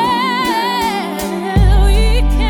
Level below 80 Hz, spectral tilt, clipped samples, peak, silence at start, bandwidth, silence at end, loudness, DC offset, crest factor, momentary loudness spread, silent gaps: -14 dBFS; -5.5 dB/octave; under 0.1%; 0 dBFS; 0 s; 17.5 kHz; 0 s; -15 LUFS; under 0.1%; 12 dB; 7 LU; none